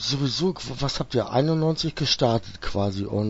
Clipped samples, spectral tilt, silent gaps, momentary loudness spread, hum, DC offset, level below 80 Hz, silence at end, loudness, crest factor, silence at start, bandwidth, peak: under 0.1%; -5.5 dB/octave; none; 6 LU; none; under 0.1%; -42 dBFS; 0 s; -24 LUFS; 18 dB; 0 s; 8 kHz; -6 dBFS